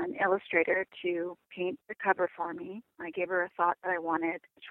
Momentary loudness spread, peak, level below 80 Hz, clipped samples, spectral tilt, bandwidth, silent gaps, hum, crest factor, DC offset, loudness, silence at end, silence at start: 12 LU; -10 dBFS; -76 dBFS; under 0.1%; -8 dB/octave; 4 kHz; none; none; 22 dB; under 0.1%; -31 LUFS; 0 s; 0 s